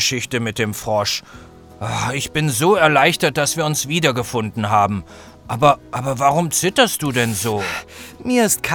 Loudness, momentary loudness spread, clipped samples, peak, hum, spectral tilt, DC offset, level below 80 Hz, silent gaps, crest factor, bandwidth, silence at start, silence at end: -18 LUFS; 11 LU; under 0.1%; 0 dBFS; none; -3.5 dB/octave; under 0.1%; -48 dBFS; none; 18 dB; over 20 kHz; 0 s; 0 s